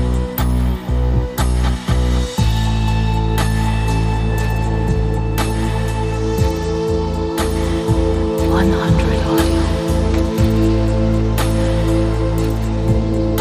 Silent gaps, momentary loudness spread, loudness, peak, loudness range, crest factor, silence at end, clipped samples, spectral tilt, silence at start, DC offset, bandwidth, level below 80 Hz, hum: none; 4 LU; -17 LUFS; -2 dBFS; 2 LU; 14 dB; 0 s; under 0.1%; -6.5 dB/octave; 0 s; under 0.1%; 15.5 kHz; -20 dBFS; none